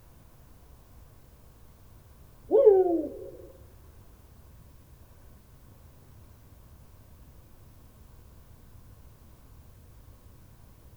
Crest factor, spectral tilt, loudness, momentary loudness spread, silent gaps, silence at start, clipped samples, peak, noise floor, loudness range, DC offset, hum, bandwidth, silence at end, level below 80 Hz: 26 dB; -8.5 dB/octave; -23 LUFS; 33 LU; none; 2.5 s; under 0.1%; -8 dBFS; -53 dBFS; 11 LU; under 0.1%; none; over 20 kHz; 7.65 s; -56 dBFS